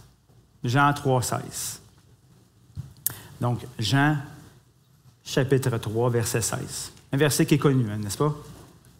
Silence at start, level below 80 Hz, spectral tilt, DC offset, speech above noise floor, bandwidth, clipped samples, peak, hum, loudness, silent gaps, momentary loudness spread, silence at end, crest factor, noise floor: 0.65 s; -58 dBFS; -5 dB/octave; under 0.1%; 34 dB; 16 kHz; under 0.1%; -4 dBFS; none; -25 LUFS; none; 17 LU; 0.35 s; 24 dB; -58 dBFS